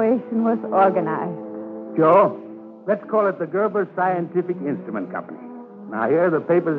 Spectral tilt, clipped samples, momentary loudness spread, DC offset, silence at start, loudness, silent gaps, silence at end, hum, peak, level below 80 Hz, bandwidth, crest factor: -10.5 dB/octave; under 0.1%; 16 LU; under 0.1%; 0 s; -21 LUFS; none; 0 s; none; -4 dBFS; -78 dBFS; 4.7 kHz; 16 dB